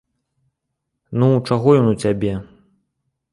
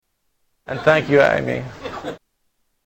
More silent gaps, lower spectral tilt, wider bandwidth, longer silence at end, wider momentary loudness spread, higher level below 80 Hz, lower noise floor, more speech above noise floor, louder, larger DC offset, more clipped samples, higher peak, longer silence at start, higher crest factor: neither; first, -8 dB/octave vs -6 dB/octave; second, 11.5 kHz vs 16 kHz; first, 0.9 s vs 0.7 s; second, 12 LU vs 17 LU; about the same, -48 dBFS vs -50 dBFS; first, -77 dBFS vs -69 dBFS; first, 61 dB vs 52 dB; about the same, -17 LUFS vs -17 LUFS; neither; neither; about the same, -2 dBFS vs 0 dBFS; first, 1.1 s vs 0.7 s; about the same, 18 dB vs 20 dB